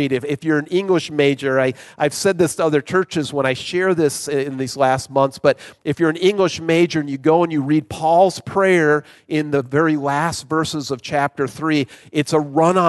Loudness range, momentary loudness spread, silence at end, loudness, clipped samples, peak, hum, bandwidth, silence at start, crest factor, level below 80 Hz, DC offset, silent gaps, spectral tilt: 2 LU; 6 LU; 0 s; -18 LUFS; under 0.1%; -2 dBFS; none; 12.5 kHz; 0 s; 16 dB; -54 dBFS; under 0.1%; none; -5.5 dB/octave